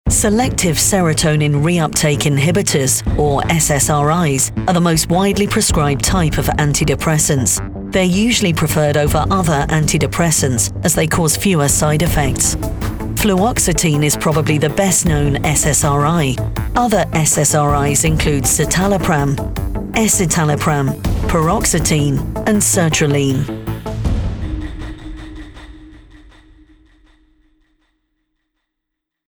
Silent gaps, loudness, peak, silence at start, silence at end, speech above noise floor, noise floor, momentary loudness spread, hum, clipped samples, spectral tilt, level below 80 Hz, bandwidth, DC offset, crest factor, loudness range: none; -14 LUFS; -2 dBFS; 0.05 s; 3.35 s; 64 dB; -78 dBFS; 8 LU; none; under 0.1%; -4.5 dB/octave; -28 dBFS; over 20 kHz; under 0.1%; 12 dB; 3 LU